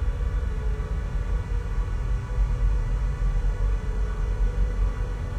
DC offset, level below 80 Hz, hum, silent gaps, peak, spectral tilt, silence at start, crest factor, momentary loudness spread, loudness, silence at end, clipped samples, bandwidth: under 0.1%; -24 dBFS; none; none; -14 dBFS; -7.5 dB/octave; 0 s; 12 dB; 3 LU; -29 LUFS; 0 s; under 0.1%; 7.2 kHz